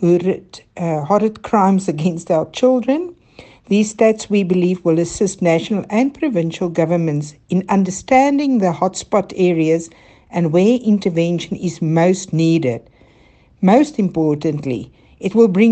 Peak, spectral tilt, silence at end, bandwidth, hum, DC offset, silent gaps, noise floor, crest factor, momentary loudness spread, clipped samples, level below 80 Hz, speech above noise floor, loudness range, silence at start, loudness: 0 dBFS; -6.5 dB/octave; 0 s; 9 kHz; none; under 0.1%; none; -50 dBFS; 16 dB; 8 LU; under 0.1%; -52 dBFS; 34 dB; 1 LU; 0 s; -17 LUFS